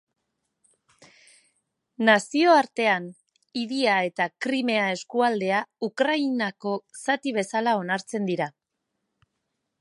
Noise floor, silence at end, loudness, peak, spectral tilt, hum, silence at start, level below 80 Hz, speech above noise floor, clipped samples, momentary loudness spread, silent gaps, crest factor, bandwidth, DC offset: -80 dBFS; 1.3 s; -24 LUFS; -4 dBFS; -4.5 dB/octave; none; 2 s; -80 dBFS; 56 dB; under 0.1%; 11 LU; none; 22 dB; 11.5 kHz; under 0.1%